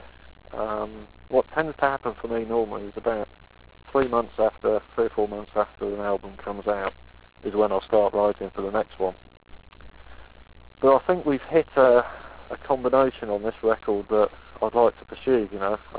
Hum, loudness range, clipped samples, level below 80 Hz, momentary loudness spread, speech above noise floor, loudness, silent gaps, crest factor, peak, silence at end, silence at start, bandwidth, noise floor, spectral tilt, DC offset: none; 5 LU; under 0.1%; -50 dBFS; 11 LU; 22 dB; -25 LUFS; none; 20 dB; -6 dBFS; 0 s; 0.5 s; 4 kHz; -46 dBFS; -10 dB/octave; 0.2%